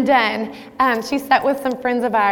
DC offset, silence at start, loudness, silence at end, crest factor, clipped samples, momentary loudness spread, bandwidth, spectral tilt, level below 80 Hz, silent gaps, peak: under 0.1%; 0 s; -18 LUFS; 0 s; 14 dB; under 0.1%; 6 LU; 18 kHz; -4.5 dB/octave; -56 dBFS; none; -4 dBFS